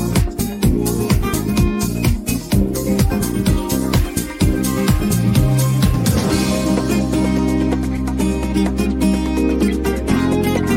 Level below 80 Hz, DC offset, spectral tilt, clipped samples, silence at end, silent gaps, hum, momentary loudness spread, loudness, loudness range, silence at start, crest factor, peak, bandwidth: -24 dBFS; under 0.1%; -6 dB/octave; under 0.1%; 0 s; none; none; 3 LU; -17 LUFS; 2 LU; 0 s; 14 dB; -2 dBFS; 17 kHz